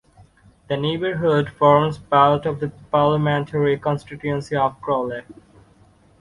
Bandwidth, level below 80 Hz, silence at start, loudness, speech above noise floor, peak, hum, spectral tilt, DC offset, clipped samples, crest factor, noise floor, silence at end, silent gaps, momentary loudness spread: 11 kHz; -52 dBFS; 0.7 s; -20 LUFS; 34 dB; -2 dBFS; none; -7.5 dB/octave; under 0.1%; under 0.1%; 18 dB; -53 dBFS; 0.9 s; none; 11 LU